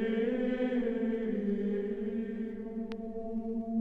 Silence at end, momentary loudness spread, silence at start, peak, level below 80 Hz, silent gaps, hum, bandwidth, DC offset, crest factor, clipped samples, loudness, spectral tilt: 0 s; 8 LU; 0 s; -20 dBFS; -56 dBFS; none; none; 5.2 kHz; under 0.1%; 12 dB; under 0.1%; -34 LUFS; -9 dB/octave